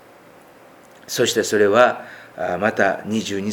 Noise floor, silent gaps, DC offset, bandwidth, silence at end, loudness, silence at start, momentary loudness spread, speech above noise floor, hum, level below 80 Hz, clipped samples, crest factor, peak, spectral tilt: -47 dBFS; none; under 0.1%; 20 kHz; 0 s; -19 LUFS; 1.1 s; 14 LU; 28 dB; none; -64 dBFS; under 0.1%; 20 dB; 0 dBFS; -3.5 dB/octave